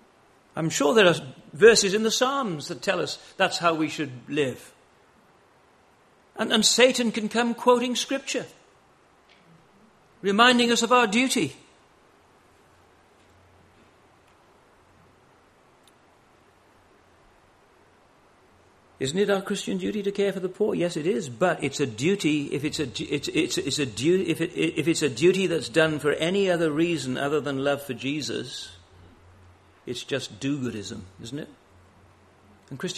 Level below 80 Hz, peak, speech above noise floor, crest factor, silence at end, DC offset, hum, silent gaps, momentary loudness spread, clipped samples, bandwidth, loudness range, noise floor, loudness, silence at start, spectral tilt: -64 dBFS; -2 dBFS; 35 dB; 24 dB; 0 s; under 0.1%; none; none; 15 LU; under 0.1%; 13 kHz; 10 LU; -59 dBFS; -24 LUFS; 0.55 s; -3.5 dB/octave